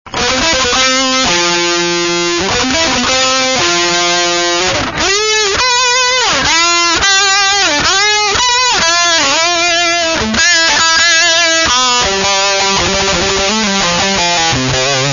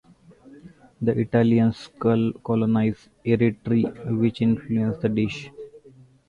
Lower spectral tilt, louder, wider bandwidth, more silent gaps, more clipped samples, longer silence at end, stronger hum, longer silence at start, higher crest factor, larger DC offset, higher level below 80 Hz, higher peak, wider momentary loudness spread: second, -1 dB/octave vs -9 dB/octave; first, -9 LUFS vs -23 LUFS; about the same, 7.4 kHz vs 7 kHz; neither; neither; second, 0 s vs 0.5 s; neither; second, 0.05 s vs 0.65 s; about the same, 12 dB vs 16 dB; neither; first, -36 dBFS vs -54 dBFS; first, 0 dBFS vs -6 dBFS; second, 4 LU vs 9 LU